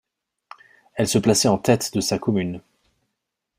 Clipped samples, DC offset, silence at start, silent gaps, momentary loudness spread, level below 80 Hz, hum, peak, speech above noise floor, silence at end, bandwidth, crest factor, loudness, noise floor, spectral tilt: under 0.1%; under 0.1%; 0.95 s; none; 13 LU; -56 dBFS; none; -2 dBFS; 60 dB; 1 s; 16 kHz; 20 dB; -21 LUFS; -80 dBFS; -4.5 dB/octave